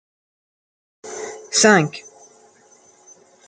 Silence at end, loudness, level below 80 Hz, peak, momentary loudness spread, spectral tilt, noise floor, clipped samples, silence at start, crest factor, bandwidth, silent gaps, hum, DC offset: 1.5 s; -16 LUFS; -72 dBFS; -2 dBFS; 22 LU; -3 dB/octave; -53 dBFS; under 0.1%; 1.05 s; 22 dB; 10 kHz; none; none; under 0.1%